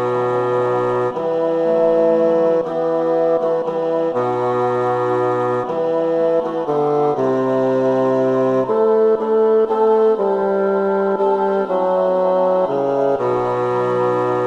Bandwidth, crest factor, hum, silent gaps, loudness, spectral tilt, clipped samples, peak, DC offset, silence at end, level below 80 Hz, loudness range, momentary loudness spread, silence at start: 7.6 kHz; 12 dB; none; none; -17 LUFS; -8 dB/octave; under 0.1%; -6 dBFS; under 0.1%; 0 s; -58 dBFS; 2 LU; 4 LU; 0 s